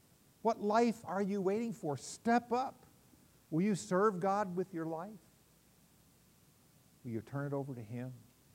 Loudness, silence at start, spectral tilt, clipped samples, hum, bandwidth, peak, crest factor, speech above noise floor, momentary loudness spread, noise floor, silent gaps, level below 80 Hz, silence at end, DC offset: -36 LUFS; 0.45 s; -6.5 dB/octave; under 0.1%; none; 16 kHz; -18 dBFS; 20 dB; 32 dB; 13 LU; -67 dBFS; none; -78 dBFS; 0.35 s; under 0.1%